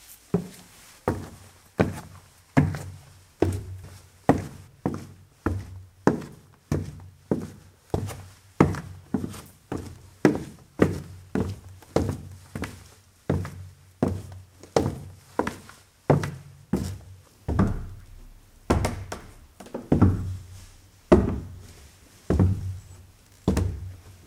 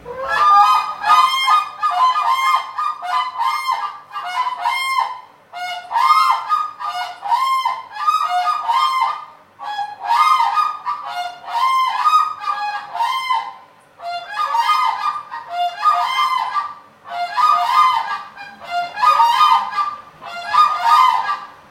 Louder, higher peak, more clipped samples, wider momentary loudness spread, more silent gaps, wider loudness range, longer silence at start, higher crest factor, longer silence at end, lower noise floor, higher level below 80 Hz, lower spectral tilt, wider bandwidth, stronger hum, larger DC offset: second, -28 LUFS vs -17 LUFS; about the same, 0 dBFS vs 0 dBFS; neither; first, 21 LU vs 14 LU; neither; about the same, 5 LU vs 4 LU; about the same, 0.1 s vs 0 s; first, 28 dB vs 16 dB; about the same, 0.15 s vs 0.15 s; first, -52 dBFS vs -43 dBFS; first, -42 dBFS vs -66 dBFS; first, -7.5 dB/octave vs 0.5 dB/octave; about the same, 16 kHz vs 16.5 kHz; neither; neither